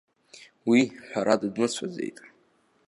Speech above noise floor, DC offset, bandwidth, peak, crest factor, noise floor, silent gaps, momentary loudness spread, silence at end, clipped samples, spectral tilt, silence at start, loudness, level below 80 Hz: 40 dB; under 0.1%; 11.5 kHz; -6 dBFS; 22 dB; -65 dBFS; none; 12 LU; 0.6 s; under 0.1%; -4.5 dB/octave; 0.4 s; -26 LUFS; -74 dBFS